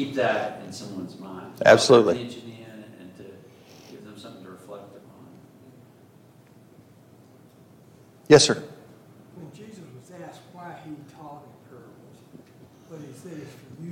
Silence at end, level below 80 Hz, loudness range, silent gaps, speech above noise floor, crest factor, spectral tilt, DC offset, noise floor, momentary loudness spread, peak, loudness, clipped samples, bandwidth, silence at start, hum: 0 s; -66 dBFS; 23 LU; none; 33 dB; 26 dB; -4 dB/octave; under 0.1%; -53 dBFS; 29 LU; -2 dBFS; -20 LUFS; under 0.1%; 16 kHz; 0 s; none